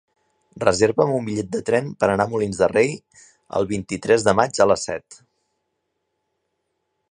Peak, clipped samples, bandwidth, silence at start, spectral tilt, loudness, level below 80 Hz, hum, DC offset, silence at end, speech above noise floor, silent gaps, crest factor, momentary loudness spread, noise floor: 0 dBFS; under 0.1%; 11 kHz; 0.55 s; -5 dB/octave; -20 LUFS; -52 dBFS; none; under 0.1%; 1.95 s; 55 dB; none; 22 dB; 8 LU; -75 dBFS